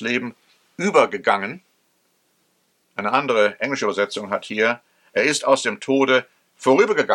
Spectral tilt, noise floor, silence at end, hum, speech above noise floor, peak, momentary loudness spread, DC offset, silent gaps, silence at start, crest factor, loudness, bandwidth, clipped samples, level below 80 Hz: -3.5 dB/octave; -66 dBFS; 0 s; none; 46 dB; 0 dBFS; 10 LU; under 0.1%; none; 0 s; 20 dB; -20 LUFS; 12.5 kHz; under 0.1%; -76 dBFS